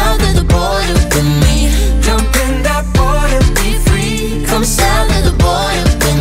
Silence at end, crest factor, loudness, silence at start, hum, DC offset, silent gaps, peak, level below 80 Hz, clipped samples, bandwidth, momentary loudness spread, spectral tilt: 0 s; 10 dB; -12 LUFS; 0 s; none; under 0.1%; none; 0 dBFS; -14 dBFS; under 0.1%; 16.5 kHz; 3 LU; -4.5 dB/octave